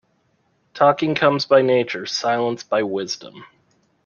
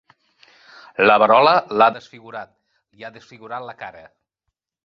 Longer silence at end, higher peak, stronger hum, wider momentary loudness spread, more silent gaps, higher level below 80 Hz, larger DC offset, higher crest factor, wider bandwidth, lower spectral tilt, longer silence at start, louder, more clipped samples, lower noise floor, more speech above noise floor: second, 0.6 s vs 0.95 s; about the same, -2 dBFS vs 0 dBFS; neither; second, 9 LU vs 25 LU; neither; about the same, -66 dBFS vs -66 dBFS; neither; about the same, 18 dB vs 20 dB; about the same, 7.2 kHz vs 7 kHz; about the same, -4.5 dB/octave vs -5.5 dB/octave; second, 0.75 s vs 1 s; second, -19 LUFS vs -15 LUFS; neither; second, -65 dBFS vs -79 dBFS; second, 46 dB vs 61 dB